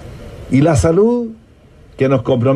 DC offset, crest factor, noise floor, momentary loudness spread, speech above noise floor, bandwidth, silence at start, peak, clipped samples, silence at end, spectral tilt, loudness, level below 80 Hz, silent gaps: under 0.1%; 12 dB; -44 dBFS; 18 LU; 31 dB; 12.5 kHz; 0 s; -4 dBFS; under 0.1%; 0 s; -7.5 dB/octave; -14 LUFS; -36 dBFS; none